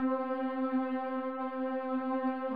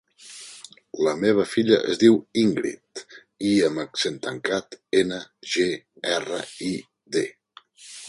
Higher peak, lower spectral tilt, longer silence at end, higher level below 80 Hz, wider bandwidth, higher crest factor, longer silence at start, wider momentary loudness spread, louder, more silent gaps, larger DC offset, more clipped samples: second, -22 dBFS vs -4 dBFS; first, -7.5 dB/octave vs -4.5 dB/octave; about the same, 0 s vs 0 s; second, -84 dBFS vs -64 dBFS; second, 4.8 kHz vs 11.5 kHz; second, 12 dB vs 20 dB; second, 0 s vs 0.25 s; second, 3 LU vs 20 LU; second, -34 LUFS vs -24 LUFS; neither; first, 0.1% vs under 0.1%; neither